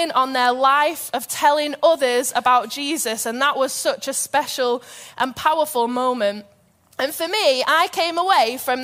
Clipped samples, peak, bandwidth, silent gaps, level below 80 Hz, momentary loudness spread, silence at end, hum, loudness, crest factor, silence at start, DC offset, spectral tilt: under 0.1%; -4 dBFS; 16 kHz; none; -66 dBFS; 8 LU; 0 s; none; -19 LUFS; 16 dB; 0 s; under 0.1%; -1 dB/octave